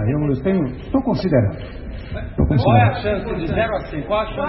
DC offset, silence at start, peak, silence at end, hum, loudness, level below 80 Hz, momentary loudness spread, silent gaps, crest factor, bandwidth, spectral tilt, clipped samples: under 0.1%; 0 s; -2 dBFS; 0 s; none; -19 LUFS; -32 dBFS; 16 LU; none; 18 dB; 5.8 kHz; -11.5 dB/octave; under 0.1%